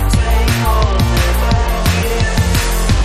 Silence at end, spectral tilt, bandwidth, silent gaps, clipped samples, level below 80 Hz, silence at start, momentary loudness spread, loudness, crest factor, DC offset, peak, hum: 0 s; -5 dB/octave; 15.5 kHz; none; under 0.1%; -16 dBFS; 0 s; 1 LU; -14 LUFS; 12 dB; under 0.1%; 0 dBFS; none